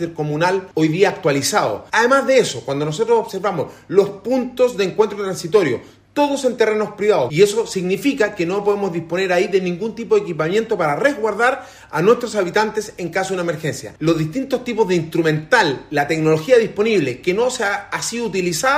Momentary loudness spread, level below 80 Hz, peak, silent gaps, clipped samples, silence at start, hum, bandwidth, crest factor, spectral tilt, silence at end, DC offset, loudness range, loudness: 7 LU; -56 dBFS; 0 dBFS; none; under 0.1%; 0 s; none; 15.5 kHz; 16 dB; -4.5 dB/octave; 0 s; under 0.1%; 2 LU; -18 LUFS